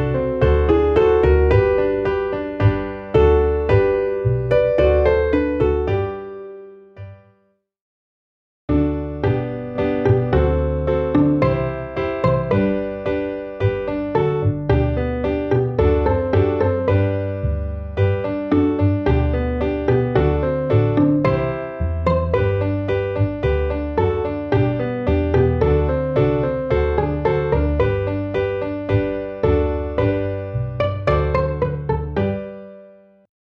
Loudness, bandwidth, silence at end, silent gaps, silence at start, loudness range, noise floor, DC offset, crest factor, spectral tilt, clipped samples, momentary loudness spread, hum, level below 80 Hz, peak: -19 LUFS; 5.8 kHz; 0.6 s; 7.81-8.68 s; 0 s; 5 LU; -63 dBFS; under 0.1%; 16 dB; -10 dB/octave; under 0.1%; 8 LU; none; -28 dBFS; -4 dBFS